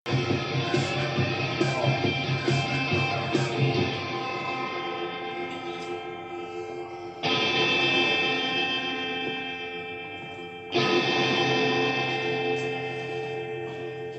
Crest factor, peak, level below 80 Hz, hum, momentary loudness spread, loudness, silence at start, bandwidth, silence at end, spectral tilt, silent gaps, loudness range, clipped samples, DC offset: 16 dB; -10 dBFS; -64 dBFS; none; 13 LU; -26 LUFS; 0.05 s; 8.6 kHz; 0 s; -5 dB/octave; none; 5 LU; under 0.1%; under 0.1%